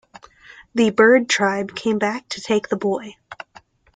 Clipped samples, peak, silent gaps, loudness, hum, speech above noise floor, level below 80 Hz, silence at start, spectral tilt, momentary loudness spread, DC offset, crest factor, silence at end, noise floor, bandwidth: under 0.1%; -2 dBFS; none; -19 LUFS; none; 32 dB; -62 dBFS; 0.6 s; -4 dB/octave; 24 LU; under 0.1%; 18 dB; 0.6 s; -50 dBFS; 9.4 kHz